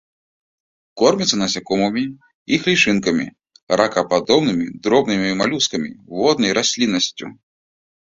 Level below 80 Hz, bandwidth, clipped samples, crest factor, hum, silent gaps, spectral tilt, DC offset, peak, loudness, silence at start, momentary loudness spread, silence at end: -56 dBFS; 7.8 kHz; under 0.1%; 18 dB; none; 2.35-2.46 s, 3.62-3.67 s; -3.5 dB/octave; under 0.1%; 0 dBFS; -18 LUFS; 0.95 s; 9 LU; 0.75 s